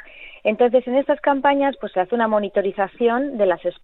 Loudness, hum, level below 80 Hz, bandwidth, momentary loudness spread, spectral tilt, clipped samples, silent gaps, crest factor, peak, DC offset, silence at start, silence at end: -20 LUFS; none; -56 dBFS; 4.1 kHz; 6 LU; -9.5 dB/octave; under 0.1%; none; 16 dB; -4 dBFS; under 0.1%; 0.15 s; 0.1 s